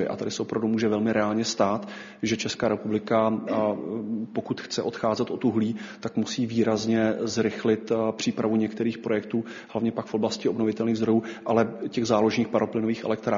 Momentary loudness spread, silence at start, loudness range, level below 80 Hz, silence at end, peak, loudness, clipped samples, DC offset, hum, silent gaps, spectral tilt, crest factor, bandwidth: 7 LU; 0 s; 2 LU; -64 dBFS; 0 s; -8 dBFS; -26 LUFS; under 0.1%; under 0.1%; none; none; -5 dB/octave; 18 dB; 7.4 kHz